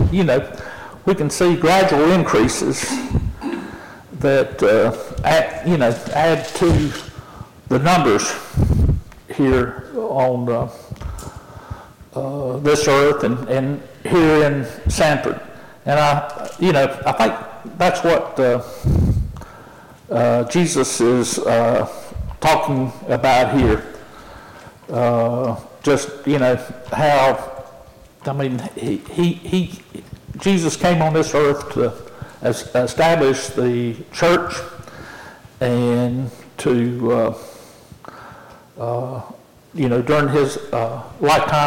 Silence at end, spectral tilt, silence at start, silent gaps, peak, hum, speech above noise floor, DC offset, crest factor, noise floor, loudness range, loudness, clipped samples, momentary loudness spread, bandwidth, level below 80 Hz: 0 s; -5.5 dB/octave; 0 s; none; -8 dBFS; none; 26 dB; under 0.1%; 10 dB; -43 dBFS; 4 LU; -18 LUFS; under 0.1%; 19 LU; 17 kHz; -34 dBFS